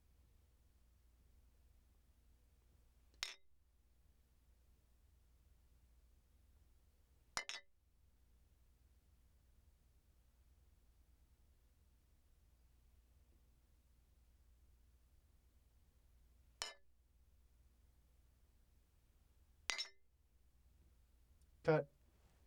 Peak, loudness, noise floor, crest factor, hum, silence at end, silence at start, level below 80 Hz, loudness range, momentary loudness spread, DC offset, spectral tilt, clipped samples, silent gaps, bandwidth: -14 dBFS; -45 LUFS; -73 dBFS; 42 dB; 60 Hz at -90 dBFS; 0.6 s; 3.2 s; -72 dBFS; 12 LU; 13 LU; under 0.1%; -3.5 dB/octave; under 0.1%; none; 19 kHz